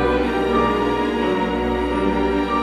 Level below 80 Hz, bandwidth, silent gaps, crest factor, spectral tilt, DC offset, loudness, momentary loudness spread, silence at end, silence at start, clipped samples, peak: -32 dBFS; 13 kHz; none; 14 dB; -6.5 dB/octave; under 0.1%; -20 LUFS; 3 LU; 0 s; 0 s; under 0.1%; -4 dBFS